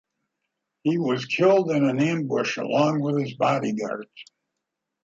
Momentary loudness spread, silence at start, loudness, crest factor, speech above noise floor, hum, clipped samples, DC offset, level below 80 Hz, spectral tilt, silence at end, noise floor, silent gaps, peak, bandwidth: 10 LU; 0.85 s; -23 LUFS; 18 dB; 60 dB; none; under 0.1%; under 0.1%; -70 dBFS; -6.5 dB/octave; 0.8 s; -83 dBFS; none; -6 dBFS; 7.8 kHz